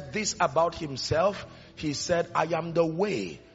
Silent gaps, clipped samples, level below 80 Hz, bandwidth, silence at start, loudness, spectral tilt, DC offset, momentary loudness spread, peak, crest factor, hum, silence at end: none; under 0.1%; -54 dBFS; 8 kHz; 0 s; -28 LUFS; -4 dB/octave; under 0.1%; 8 LU; -10 dBFS; 18 dB; none; 0.15 s